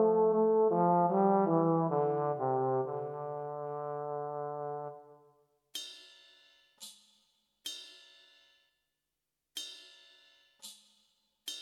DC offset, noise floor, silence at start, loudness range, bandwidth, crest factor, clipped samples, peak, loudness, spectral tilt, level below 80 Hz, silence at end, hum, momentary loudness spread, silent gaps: under 0.1%; -87 dBFS; 0 s; 20 LU; 15 kHz; 18 dB; under 0.1%; -14 dBFS; -32 LUFS; -6.5 dB/octave; under -90 dBFS; 0 s; none; 23 LU; none